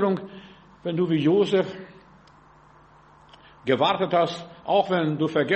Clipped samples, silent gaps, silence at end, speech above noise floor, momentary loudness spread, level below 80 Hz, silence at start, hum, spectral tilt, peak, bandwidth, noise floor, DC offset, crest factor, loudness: under 0.1%; none; 0 s; 30 dB; 15 LU; -64 dBFS; 0 s; none; -7 dB/octave; -8 dBFS; 8.4 kHz; -53 dBFS; under 0.1%; 18 dB; -24 LUFS